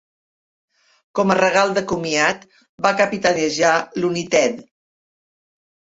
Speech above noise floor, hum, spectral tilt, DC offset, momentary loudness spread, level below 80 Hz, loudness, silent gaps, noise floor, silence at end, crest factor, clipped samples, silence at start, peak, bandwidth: over 72 dB; none; -3.5 dB/octave; under 0.1%; 7 LU; -60 dBFS; -18 LUFS; 2.69-2.78 s; under -90 dBFS; 1.35 s; 18 dB; under 0.1%; 1.15 s; -2 dBFS; 8 kHz